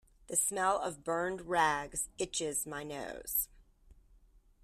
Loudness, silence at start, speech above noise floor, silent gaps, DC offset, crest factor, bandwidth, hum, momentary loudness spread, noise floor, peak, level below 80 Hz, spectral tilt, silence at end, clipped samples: -34 LUFS; 0.3 s; 29 dB; none; under 0.1%; 22 dB; 14 kHz; none; 10 LU; -63 dBFS; -14 dBFS; -60 dBFS; -2 dB/octave; 0.7 s; under 0.1%